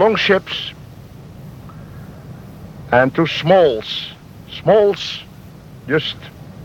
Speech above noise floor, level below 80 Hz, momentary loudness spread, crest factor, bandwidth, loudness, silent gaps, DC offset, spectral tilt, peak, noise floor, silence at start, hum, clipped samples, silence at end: 23 dB; -48 dBFS; 25 LU; 18 dB; 17 kHz; -16 LUFS; none; under 0.1%; -6 dB/octave; 0 dBFS; -38 dBFS; 0 s; none; under 0.1%; 0 s